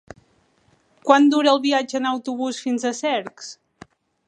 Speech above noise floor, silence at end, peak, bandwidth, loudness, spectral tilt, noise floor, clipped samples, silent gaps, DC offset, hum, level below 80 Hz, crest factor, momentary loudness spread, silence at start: 41 dB; 0.75 s; 0 dBFS; 10 kHz; -20 LUFS; -3 dB/octave; -61 dBFS; under 0.1%; none; under 0.1%; none; -68 dBFS; 22 dB; 17 LU; 1.05 s